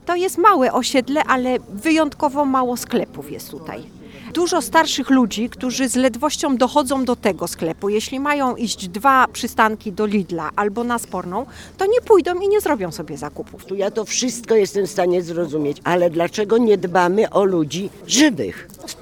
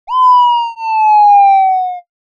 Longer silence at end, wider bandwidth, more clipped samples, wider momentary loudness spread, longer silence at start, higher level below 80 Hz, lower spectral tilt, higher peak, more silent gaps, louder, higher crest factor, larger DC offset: second, 0 s vs 0.35 s; first, 18.5 kHz vs 7 kHz; neither; first, 13 LU vs 10 LU; about the same, 0.05 s vs 0.1 s; first, -50 dBFS vs -70 dBFS; first, -4 dB/octave vs 2 dB/octave; about the same, 0 dBFS vs -2 dBFS; neither; second, -18 LUFS vs -9 LUFS; first, 18 dB vs 8 dB; neither